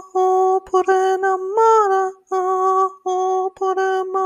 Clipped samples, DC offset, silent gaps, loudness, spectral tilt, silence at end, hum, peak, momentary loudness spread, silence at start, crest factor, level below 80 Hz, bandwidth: under 0.1%; under 0.1%; none; -18 LUFS; -3 dB/octave; 0 s; none; -4 dBFS; 6 LU; 0 s; 14 dB; -64 dBFS; 9.8 kHz